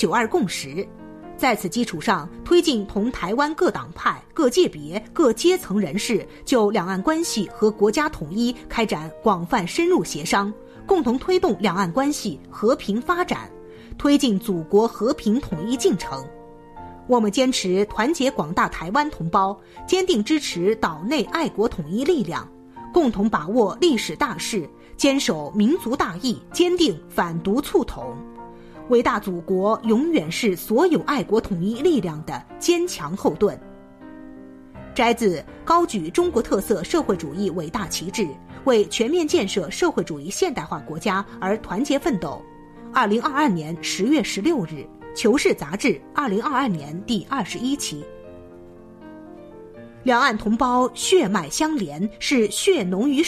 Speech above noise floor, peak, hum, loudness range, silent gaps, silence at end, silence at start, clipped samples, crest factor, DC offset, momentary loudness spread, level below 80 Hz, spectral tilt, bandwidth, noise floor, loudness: 22 dB; -6 dBFS; none; 3 LU; none; 0 s; 0 s; under 0.1%; 16 dB; under 0.1%; 13 LU; -48 dBFS; -4.5 dB/octave; 14 kHz; -43 dBFS; -22 LUFS